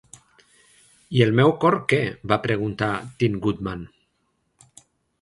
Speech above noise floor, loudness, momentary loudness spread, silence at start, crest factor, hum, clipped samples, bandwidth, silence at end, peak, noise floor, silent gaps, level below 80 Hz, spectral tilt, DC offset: 50 dB; -22 LUFS; 13 LU; 1.1 s; 22 dB; none; under 0.1%; 11.5 kHz; 1.35 s; -2 dBFS; -71 dBFS; none; -52 dBFS; -7 dB/octave; under 0.1%